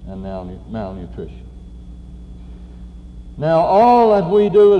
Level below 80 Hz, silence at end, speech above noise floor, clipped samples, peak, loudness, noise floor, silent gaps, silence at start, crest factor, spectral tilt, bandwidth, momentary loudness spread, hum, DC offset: -36 dBFS; 0 s; 21 dB; under 0.1%; -4 dBFS; -14 LUFS; -35 dBFS; none; 0 s; 14 dB; -8.5 dB/octave; 6.2 kHz; 27 LU; none; under 0.1%